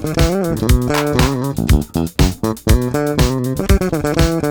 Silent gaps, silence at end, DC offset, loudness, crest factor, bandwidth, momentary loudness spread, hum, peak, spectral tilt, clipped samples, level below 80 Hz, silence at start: none; 0 s; under 0.1%; -16 LUFS; 14 dB; over 20 kHz; 3 LU; none; 0 dBFS; -6 dB/octave; under 0.1%; -20 dBFS; 0 s